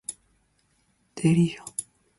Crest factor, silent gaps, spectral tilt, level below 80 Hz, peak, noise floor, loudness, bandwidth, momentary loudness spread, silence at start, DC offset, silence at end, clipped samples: 18 dB; none; -6 dB/octave; -60 dBFS; -10 dBFS; -68 dBFS; -25 LUFS; 11.5 kHz; 16 LU; 0.1 s; under 0.1%; 0.35 s; under 0.1%